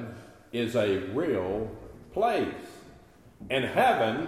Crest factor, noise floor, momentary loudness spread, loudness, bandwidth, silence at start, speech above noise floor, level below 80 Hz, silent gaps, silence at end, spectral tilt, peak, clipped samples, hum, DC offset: 18 dB; -54 dBFS; 21 LU; -28 LUFS; 15 kHz; 0 s; 27 dB; -56 dBFS; none; 0 s; -6 dB/octave; -12 dBFS; under 0.1%; none; under 0.1%